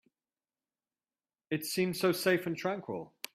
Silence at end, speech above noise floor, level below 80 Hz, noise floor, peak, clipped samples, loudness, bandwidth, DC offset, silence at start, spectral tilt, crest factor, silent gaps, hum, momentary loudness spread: 0.3 s; over 58 dB; -76 dBFS; under -90 dBFS; -14 dBFS; under 0.1%; -33 LUFS; 15.5 kHz; under 0.1%; 1.5 s; -4.5 dB/octave; 22 dB; none; none; 10 LU